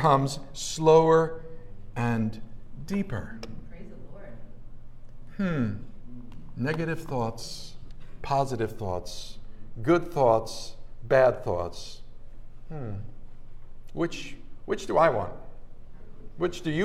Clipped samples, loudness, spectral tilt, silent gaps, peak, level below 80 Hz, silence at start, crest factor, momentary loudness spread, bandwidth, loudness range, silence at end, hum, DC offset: under 0.1%; -27 LUFS; -6 dB/octave; none; -6 dBFS; -44 dBFS; 0 s; 22 dB; 25 LU; 13.5 kHz; 10 LU; 0 s; none; under 0.1%